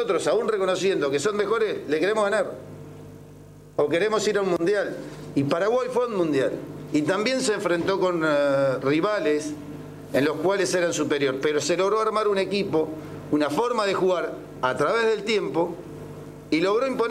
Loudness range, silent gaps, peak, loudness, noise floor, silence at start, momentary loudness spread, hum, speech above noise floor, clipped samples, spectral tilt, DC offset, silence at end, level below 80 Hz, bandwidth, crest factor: 2 LU; none; -8 dBFS; -24 LUFS; -46 dBFS; 0 s; 12 LU; none; 23 dB; under 0.1%; -4.5 dB/octave; under 0.1%; 0 s; -58 dBFS; 15 kHz; 16 dB